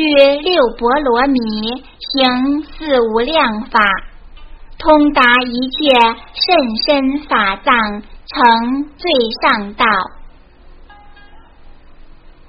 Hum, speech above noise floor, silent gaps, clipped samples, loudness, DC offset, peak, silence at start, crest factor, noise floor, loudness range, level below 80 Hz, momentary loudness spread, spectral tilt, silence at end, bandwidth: none; 27 dB; none; under 0.1%; -13 LUFS; under 0.1%; 0 dBFS; 0 s; 14 dB; -40 dBFS; 4 LU; -36 dBFS; 10 LU; -5.5 dB/octave; 0.45 s; 6.6 kHz